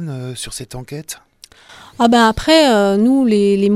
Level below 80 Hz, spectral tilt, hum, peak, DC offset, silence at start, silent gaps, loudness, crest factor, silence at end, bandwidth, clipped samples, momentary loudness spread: -42 dBFS; -5 dB/octave; none; 0 dBFS; under 0.1%; 0 s; none; -12 LUFS; 14 dB; 0 s; 14.5 kHz; under 0.1%; 18 LU